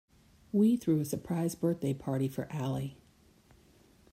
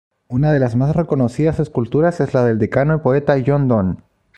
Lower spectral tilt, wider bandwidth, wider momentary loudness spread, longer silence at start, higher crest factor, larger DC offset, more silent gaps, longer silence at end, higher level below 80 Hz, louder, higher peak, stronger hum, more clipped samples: second, -7.5 dB/octave vs -9.5 dB/octave; first, 16 kHz vs 9.2 kHz; first, 9 LU vs 4 LU; first, 0.55 s vs 0.3 s; about the same, 16 dB vs 14 dB; neither; neither; first, 1.2 s vs 0.4 s; second, -64 dBFS vs -42 dBFS; second, -32 LUFS vs -17 LUFS; second, -18 dBFS vs -2 dBFS; neither; neither